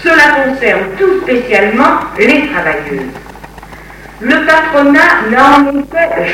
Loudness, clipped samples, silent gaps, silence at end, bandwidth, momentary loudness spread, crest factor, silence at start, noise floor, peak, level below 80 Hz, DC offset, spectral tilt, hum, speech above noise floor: -9 LUFS; 0.9%; none; 0 s; 16 kHz; 10 LU; 10 dB; 0 s; -31 dBFS; 0 dBFS; -38 dBFS; under 0.1%; -5 dB/octave; none; 22 dB